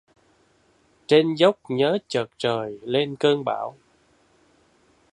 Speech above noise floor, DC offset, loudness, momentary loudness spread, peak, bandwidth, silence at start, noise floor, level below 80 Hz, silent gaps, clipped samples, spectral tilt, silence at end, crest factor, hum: 40 dB; under 0.1%; -22 LUFS; 10 LU; -4 dBFS; 10 kHz; 1.1 s; -62 dBFS; -68 dBFS; none; under 0.1%; -5.5 dB/octave; 1.45 s; 22 dB; none